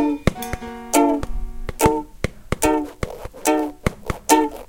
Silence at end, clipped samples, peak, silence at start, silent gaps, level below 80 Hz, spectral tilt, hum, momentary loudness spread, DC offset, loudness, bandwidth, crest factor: 0.05 s; under 0.1%; 0 dBFS; 0 s; none; -32 dBFS; -4.5 dB/octave; none; 13 LU; under 0.1%; -22 LUFS; 17 kHz; 20 dB